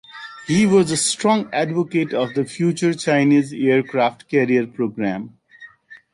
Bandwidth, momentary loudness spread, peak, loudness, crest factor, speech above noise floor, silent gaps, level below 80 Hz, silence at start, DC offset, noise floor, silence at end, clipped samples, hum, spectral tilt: 11.5 kHz; 9 LU; -4 dBFS; -19 LUFS; 14 dB; 27 dB; none; -60 dBFS; 0.15 s; under 0.1%; -46 dBFS; 0.15 s; under 0.1%; none; -5 dB/octave